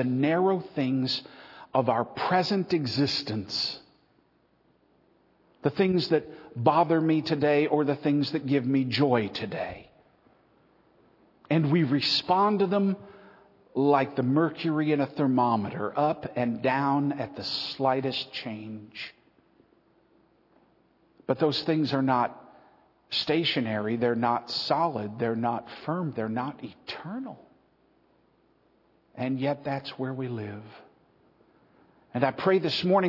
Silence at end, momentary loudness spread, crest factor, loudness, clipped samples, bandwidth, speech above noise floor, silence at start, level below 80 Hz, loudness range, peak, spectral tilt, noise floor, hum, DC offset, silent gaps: 0 s; 13 LU; 22 dB; -27 LUFS; under 0.1%; 6 kHz; 40 dB; 0 s; -70 dBFS; 9 LU; -6 dBFS; -7 dB/octave; -66 dBFS; none; under 0.1%; none